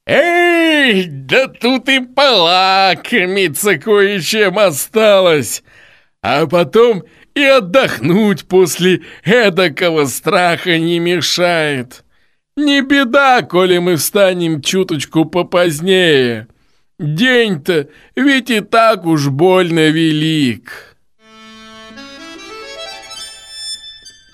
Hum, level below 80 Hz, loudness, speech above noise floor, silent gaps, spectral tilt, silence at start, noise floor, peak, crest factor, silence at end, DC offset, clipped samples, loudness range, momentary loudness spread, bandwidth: none; -54 dBFS; -12 LUFS; 46 dB; none; -4.5 dB/octave; 0.05 s; -58 dBFS; 0 dBFS; 14 dB; 0.25 s; under 0.1%; under 0.1%; 4 LU; 17 LU; 15.5 kHz